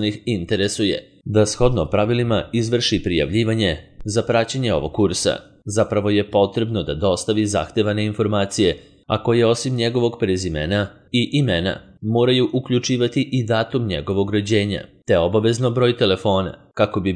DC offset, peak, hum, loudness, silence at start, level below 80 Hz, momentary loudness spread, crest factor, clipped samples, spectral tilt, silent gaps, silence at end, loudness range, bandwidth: under 0.1%; -2 dBFS; none; -20 LUFS; 0 s; -42 dBFS; 6 LU; 18 dB; under 0.1%; -5.5 dB/octave; none; 0 s; 1 LU; 11 kHz